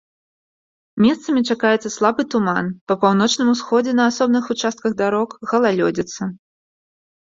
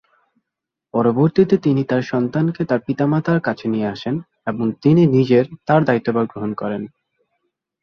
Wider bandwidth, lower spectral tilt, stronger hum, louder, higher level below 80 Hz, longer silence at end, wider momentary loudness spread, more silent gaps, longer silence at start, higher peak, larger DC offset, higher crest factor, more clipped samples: first, 7.8 kHz vs 6.6 kHz; second, -5 dB/octave vs -9 dB/octave; neither; about the same, -18 LUFS vs -18 LUFS; about the same, -60 dBFS vs -56 dBFS; about the same, 0.95 s vs 0.95 s; second, 7 LU vs 11 LU; first, 2.81-2.87 s vs none; about the same, 0.95 s vs 0.95 s; about the same, -2 dBFS vs -2 dBFS; neither; about the same, 18 dB vs 16 dB; neither